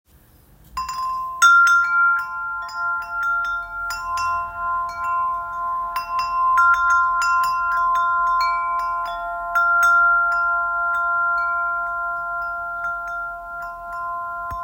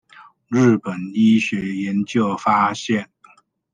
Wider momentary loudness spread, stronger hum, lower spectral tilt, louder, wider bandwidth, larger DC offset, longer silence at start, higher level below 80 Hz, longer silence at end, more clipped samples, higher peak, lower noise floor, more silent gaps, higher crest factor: first, 13 LU vs 8 LU; neither; second, -0.5 dB/octave vs -6 dB/octave; about the same, -20 LUFS vs -19 LUFS; first, 16.5 kHz vs 9.4 kHz; neither; first, 0.75 s vs 0.2 s; first, -50 dBFS vs -62 dBFS; second, 0 s vs 0.7 s; neither; about the same, -4 dBFS vs -4 dBFS; about the same, -52 dBFS vs -53 dBFS; neither; about the same, 18 dB vs 16 dB